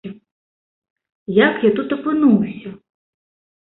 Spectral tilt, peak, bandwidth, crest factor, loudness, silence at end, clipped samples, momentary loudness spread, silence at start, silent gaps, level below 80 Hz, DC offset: -11.5 dB/octave; -2 dBFS; 4.1 kHz; 18 dB; -17 LUFS; 0.9 s; under 0.1%; 21 LU; 0.05 s; 0.32-0.82 s, 0.90-0.96 s, 1.15-1.26 s; -60 dBFS; under 0.1%